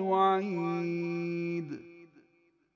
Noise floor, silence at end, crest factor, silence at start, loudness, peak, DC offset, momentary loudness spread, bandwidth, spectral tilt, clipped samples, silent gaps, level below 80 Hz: -69 dBFS; 0.7 s; 16 dB; 0 s; -31 LUFS; -16 dBFS; under 0.1%; 13 LU; 7.2 kHz; -8 dB/octave; under 0.1%; none; -82 dBFS